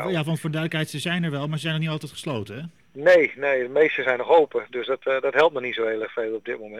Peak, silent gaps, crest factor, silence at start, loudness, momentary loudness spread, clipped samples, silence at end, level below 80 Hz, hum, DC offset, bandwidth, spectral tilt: -6 dBFS; none; 16 dB; 0 s; -23 LUFS; 12 LU; under 0.1%; 0 s; -68 dBFS; none; 0.1%; 14 kHz; -6 dB/octave